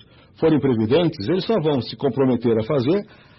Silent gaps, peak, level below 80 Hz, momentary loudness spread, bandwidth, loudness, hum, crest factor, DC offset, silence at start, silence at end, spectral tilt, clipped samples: none; -8 dBFS; -54 dBFS; 4 LU; 6 kHz; -20 LUFS; none; 12 dB; under 0.1%; 0.4 s; 0.35 s; -10 dB/octave; under 0.1%